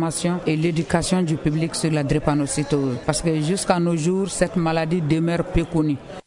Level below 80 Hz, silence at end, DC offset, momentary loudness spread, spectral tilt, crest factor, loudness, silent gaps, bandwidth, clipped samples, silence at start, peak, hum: -40 dBFS; 0.05 s; under 0.1%; 2 LU; -5.5 dB/octave; 16 dB; -21 LUFS; none; 11 kHz; under 0.1%; 0 s; -4 dBFS; none